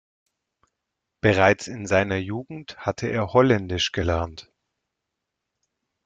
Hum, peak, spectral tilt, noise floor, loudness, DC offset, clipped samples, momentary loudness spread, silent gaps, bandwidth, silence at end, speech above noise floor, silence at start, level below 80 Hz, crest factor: none; -2 dBFS; -5.5 dB/octave; -82 dBFS; -23 LUFS; under 0.1%; under 0.1%; 13 LU; none; 9.2 kHz; 1.65 s; 60 dB; 1.25 s; -50 dBFS; 22 dB